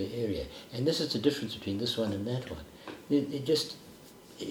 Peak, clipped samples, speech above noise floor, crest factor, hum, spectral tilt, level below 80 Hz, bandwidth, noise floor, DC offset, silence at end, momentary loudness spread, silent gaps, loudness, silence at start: -12 dBFS; under 0.1%; 20 dB; 20 dB; none; -5.5 dB/octave; -58 dBFS; 19.5 kHz; -52 dBFS; under 0.1%; 0 s; 17 LU; none; -32 LUFS; 0 s